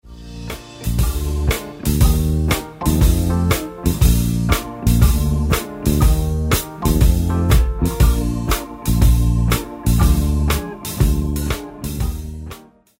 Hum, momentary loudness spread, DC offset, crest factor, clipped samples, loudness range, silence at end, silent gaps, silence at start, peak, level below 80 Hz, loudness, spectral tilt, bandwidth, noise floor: none; 10 LU; under 0.1%; 16 dB; under 0.1%; 2 LU; 0.4 s; none; 0.05 s; -2 dBFS; -20 dBFS; -18 LUFS; -5.5 dB/octave; 16.5 kHz; -39 dBFS